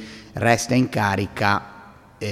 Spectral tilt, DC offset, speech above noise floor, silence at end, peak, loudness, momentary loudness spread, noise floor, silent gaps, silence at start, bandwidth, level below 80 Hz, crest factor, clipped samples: -5 dB/octave; under 0.1%; 20 dB; 0 s; -2 dBFS; -21 LUFS; 14 LU; -41 dBFS; none; 0 s; 15.5 kHz; -52 dBFS; 20 dB; under 0.1%